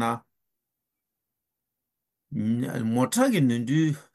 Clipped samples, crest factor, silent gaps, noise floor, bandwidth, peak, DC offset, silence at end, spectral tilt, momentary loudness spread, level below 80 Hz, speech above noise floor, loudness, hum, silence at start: under 0.1%; 16 dB; none; -85 dBFS; 12.5 kHz; -10 dBFS; under 0.1%; 0.15 s; -6 dB/octave; 10 LU; -72 dBFS; 61 dB; -25 LUFS; none; 0 s